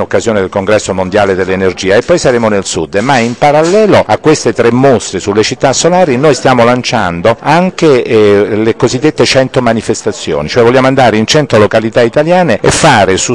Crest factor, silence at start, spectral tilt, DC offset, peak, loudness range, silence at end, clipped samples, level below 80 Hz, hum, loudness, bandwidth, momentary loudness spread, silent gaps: 8 dB; 0 s; -4.5 dB/octave; 1%; 0 dBFS; 1 LU; 0 s; 1%; -38 dBFS; none; -8 LUFS; 12 kHz; 5 LU; none